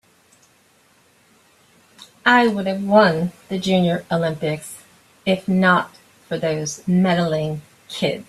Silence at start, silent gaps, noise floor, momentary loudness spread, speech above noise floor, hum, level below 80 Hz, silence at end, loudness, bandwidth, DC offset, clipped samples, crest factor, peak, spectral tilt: 2.25 s; none; -57 dBFS; 15 LU; 38 dB; none; -58 dBFS; 0.05 s; -19 LUFS; 13 kHz; under 0.1%; under 0.1%; 20 dB; -2 dBFS; -5.5 dB/octave